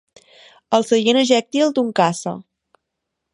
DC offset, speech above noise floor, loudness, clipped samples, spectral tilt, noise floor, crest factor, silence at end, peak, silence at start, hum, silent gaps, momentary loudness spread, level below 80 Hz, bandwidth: under 0.1%; 61 dB; -17 LUFS; under 0.1%; -4 dB/octave; -79 dBFS; 18 dB; 0.95 s; 0 dBFS; 0.7 s; none; none; 12 LU; -70 dBFS; 11.5 kHz